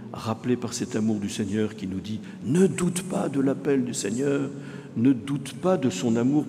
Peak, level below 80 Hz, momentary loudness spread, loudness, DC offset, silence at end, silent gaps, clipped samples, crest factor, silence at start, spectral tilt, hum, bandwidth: -10 dBFS; -64 dBFS; 10 LU; -26 LUFS; under 0.1%; 0 s; none; under 0.1%; 16 dB; 0 s; -6 dB/octave; none; 15 kHz